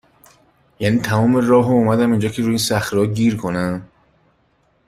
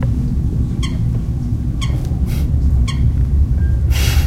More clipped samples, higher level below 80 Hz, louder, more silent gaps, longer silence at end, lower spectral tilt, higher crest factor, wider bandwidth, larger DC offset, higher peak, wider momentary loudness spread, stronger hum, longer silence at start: neither; second, -50 dBFS vs -18 dBFS; about the same, -17 LUFS vs -18 LUFS; neither; first, 1 s vs 0 s; about the same, -6 dB/octave vs -6 dB/octave; about the same, 16 dB vs 14 dB; about the same, 15.5 kHz vs 15.5 kHz; neither; about the same, -2 dBFS vs -2 dBFS; first, 8 LU vs 4 LU; neither; first, 0.8 s vs 0 s